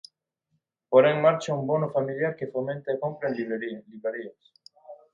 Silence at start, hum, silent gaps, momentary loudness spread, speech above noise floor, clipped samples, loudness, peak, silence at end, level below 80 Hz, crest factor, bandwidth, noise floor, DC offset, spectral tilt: 0.9 s; none; none; 14 LU; 51 dB; under 0.1%; -26 LUFS; -6 dBFS; 0.2 s; -74 dBFS; 22 dB; 7.8 kHz; -77 dBFS; under 0.1%; -6.5 dB/octave